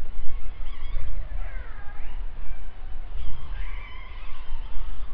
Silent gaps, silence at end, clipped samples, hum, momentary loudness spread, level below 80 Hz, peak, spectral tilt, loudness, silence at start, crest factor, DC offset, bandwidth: none; 0 s; under 0.1%; none; 5 LU; -30 dBFS; -4 dBFS; -4.5 dB/octave; -40 LUFS; 0 s; 14 dB; under 0.1%; 3.6 kHz